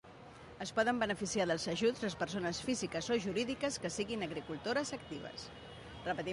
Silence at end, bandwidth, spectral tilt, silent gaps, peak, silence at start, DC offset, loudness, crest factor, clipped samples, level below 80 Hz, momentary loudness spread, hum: 0 s; 11.5 kHz; -4 dB/octave; none; -20 dBFS; 0.05 s; under 0.1%; -37 LUFS; 18 dB; under 0.1%; -62 dBFS; 14 LU; none